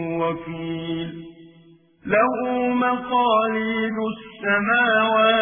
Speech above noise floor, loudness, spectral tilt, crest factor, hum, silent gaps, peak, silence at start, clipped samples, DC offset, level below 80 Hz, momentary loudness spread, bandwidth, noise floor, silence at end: 31 dB; -21 LUFS; -9 dB/octave; 16 dB; none; none; -6 dBFS; 0 s; under 0.1%; under 0.1%; -58 dBFS; 13 LU; 3.7 kHz; -52 dBFS; 0 s